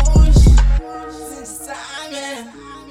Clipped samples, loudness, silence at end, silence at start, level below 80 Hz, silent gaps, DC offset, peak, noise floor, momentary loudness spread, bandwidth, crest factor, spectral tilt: under 0.1%; -15 LUFS; 0.45 s; 0 s; -16 dBFS; none; under 0.1%; -4 dBFS; -35 dBFS; 20 LU; 14 kHz; 12 dB; -6 dB/octave